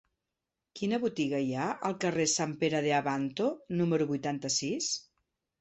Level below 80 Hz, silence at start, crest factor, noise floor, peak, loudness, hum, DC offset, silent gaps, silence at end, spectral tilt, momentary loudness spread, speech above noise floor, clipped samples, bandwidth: -72 dBFS; 0.75 s; 18 dB; -88 dBFS; -14 dBFS; -31 LUFS; none; under 0.1%; none; 0.6 s; -4 dB/octave; 5 LU; 57 dB; under 0.1%; 8.4 kHz